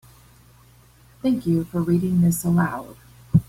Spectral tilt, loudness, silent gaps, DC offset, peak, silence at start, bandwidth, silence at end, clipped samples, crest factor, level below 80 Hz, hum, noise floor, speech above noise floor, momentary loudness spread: -7.5 dB/octave; -22 LUFS; none; under 0.1%; -4 dBFS; 1.25 s; 16 kHz; 0.05 s; under 0.1%; 18 dB; -48 dBFS; none; -52 dBFS; 31 dB; 8 LU